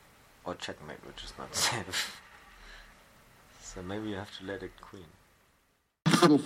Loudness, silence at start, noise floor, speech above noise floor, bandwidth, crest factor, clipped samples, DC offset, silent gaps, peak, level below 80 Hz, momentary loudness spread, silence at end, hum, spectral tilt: -32 LUFS; 0.45 s; -72 dBFS; 34 dB; 16.5 kHz; 24 dB; under 0.1%; under 0.1%; none; -10 dBFS; -60 dBFS; 23 LU; 0 s; none; -4 dB/octave